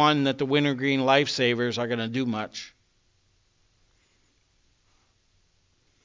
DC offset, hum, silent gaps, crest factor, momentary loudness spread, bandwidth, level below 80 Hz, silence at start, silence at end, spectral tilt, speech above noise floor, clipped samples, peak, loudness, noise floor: under 0.1%; none; none; 22 dB; 13 LU; 7.6 kHz; -68 dBFS; 0 s; 3.35 s; -5 dB/octave; 42 dB; under 0.1%; -4 dBFS; -24 LUFS; -67 dBFS